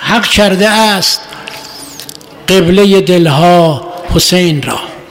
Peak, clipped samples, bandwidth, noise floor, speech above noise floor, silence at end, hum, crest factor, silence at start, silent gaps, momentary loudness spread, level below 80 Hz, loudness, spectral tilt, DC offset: 0 dBFS; under 0.1%; 16.5 kHz; -29 dBFS; 21 dB; 0.05 s; none; 10 dB; 0 s; none; 18 LU; -30 dBFS; -8 LUFS; -4.5 dB/octave; under 0.1%